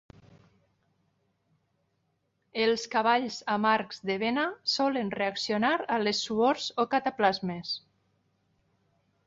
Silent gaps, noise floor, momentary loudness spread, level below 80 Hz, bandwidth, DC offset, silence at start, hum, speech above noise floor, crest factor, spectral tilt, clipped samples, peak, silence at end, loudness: none; -76 dBFS; 7 LU; -72 dBFS; 7.8 kHz; under 0.1%; 2.55 s; none; 48 dB; 20 dB; -4 dB/octave; under 0.1%; -10 dBFS; 1.5 s; -28 LUFS